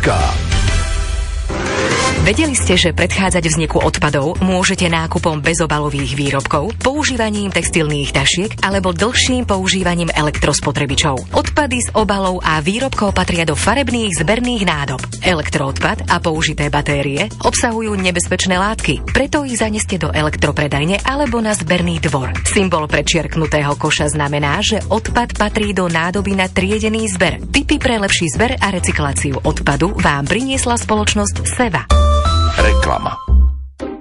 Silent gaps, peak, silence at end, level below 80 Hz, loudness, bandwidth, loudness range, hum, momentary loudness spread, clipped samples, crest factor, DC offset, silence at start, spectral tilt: none; -2 dBFS; 0 s; -24 dBFS; -15 LUFS; 11.5 kHz; 2 LU; none; 4 LU; under 0.1%; 14 dB; under 0.1%; 0 s; -4 dB/octave